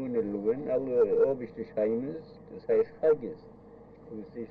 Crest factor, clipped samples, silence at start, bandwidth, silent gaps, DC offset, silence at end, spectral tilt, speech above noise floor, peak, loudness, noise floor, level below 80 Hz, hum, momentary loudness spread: 16 dB; under 0.1%; 0 s; 4.8 kHz; none; under 0.1%; 0.05 s; -10 dB/octave; 22 dB; -14 dBFS; -29 LUFS; -52 dBFS; -64 dBFS; none; 18 LU